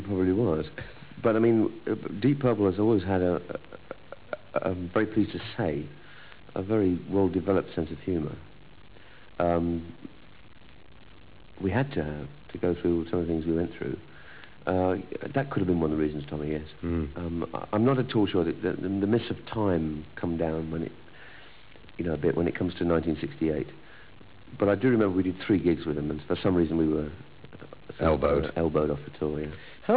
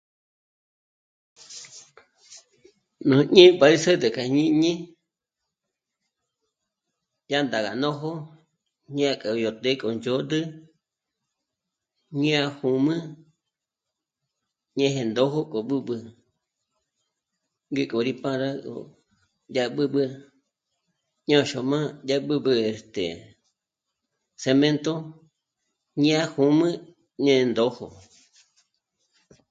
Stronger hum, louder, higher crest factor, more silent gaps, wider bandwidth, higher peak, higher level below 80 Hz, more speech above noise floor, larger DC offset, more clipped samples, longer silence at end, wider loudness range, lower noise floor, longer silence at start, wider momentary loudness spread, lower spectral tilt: neither; second, -28 LUFS vs -23 LUFS; second, 18 dB vs 26 dB; neither; second, 4 kHz vs 9 kHz; second, -10 dBFS vs 0 dBFS; first, -46 dBFS vs -68 dBFS; second, 25 dB vs 64 dB; first, 0.4% vs under 0.1%; neither; second, 0 s vs 1.6 s; second, 6 LU vs 11 LU; second, -52 dBFS vs -86 dBFS; second, 0 s vs 1.5 s; first, 20 LU vs 16 LU; first, -11.5 dB/octave vs -5.5 dB/octave